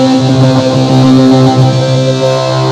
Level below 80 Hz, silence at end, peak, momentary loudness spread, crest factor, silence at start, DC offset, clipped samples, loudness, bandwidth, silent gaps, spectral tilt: -42 dBFS; 0 s; 0 dBFS; 5 LU; 6 dB; 0 s; under 0.1%; 2%; -8 LUFS; 9.8 kHz; none; -7 dB/octave